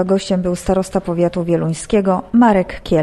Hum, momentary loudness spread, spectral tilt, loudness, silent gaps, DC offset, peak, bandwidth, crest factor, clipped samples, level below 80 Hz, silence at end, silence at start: none; 6 LU; -6.5 dB/octave; -16 LUFS; none; under 0.1%; -2 dBFS; 12.5 kHz; 14 dB; under 0.1%; -36 dBFS; 0 s; 0 s